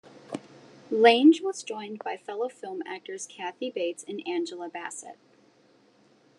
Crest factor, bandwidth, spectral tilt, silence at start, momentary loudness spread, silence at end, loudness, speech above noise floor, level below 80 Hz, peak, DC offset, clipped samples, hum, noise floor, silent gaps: 22 dB; 11 kHz; -3.5 dB/octave; 0.15 s; 21 LU; 1.25 s; -27 LUFS; 35 dB; under -90 dBFS; -6 dBFS; under 0.1%; under 0.1%; none; -61 dBFS; none